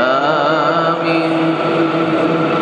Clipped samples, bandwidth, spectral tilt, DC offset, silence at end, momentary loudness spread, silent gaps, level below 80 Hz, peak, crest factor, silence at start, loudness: under 0.1%; 8.8 kHz; -6.5 dB/octave; under 0.1%; 0 s; 2 LU; none; -62 dBFS; -2 dBFS; 12 dB; 0 s; -15 LUFS